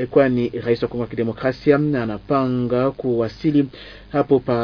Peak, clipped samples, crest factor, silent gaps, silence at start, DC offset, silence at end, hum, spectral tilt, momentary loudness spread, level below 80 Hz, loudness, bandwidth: -2 dBFS; under 0.1%; 18 dB; none; 0 s; under 0.1%; 0 s; none; -9 dB/octave; 7 LU; -48 dBFS; -20 LUFS; 5.4 kHz